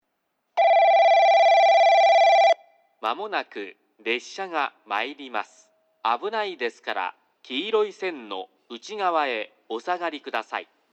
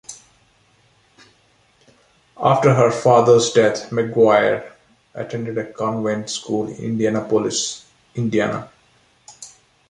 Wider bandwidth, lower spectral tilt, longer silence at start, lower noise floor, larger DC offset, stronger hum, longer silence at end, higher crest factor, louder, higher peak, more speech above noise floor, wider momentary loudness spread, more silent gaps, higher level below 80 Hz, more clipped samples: second, 8 kHz vs 11 kHz; second, -2 dB/octave vs -5 dB/octave; first, 0.55 s vs 0.1 s; first, -76 dBFS vs -58 dBFS; neither; neither; about the same, 0.3 s vs 0.4 s; about the same, 14 dB vs 18 dB; second, -22 LUFS vs -18 LUFS; second, -8 dBFS vs -2 dBFS; first, 47 dB vs 40 dB; about the same, 18 LU vs 20 LU; neither; second, under -90 dBFS vs -58 dBFS; neither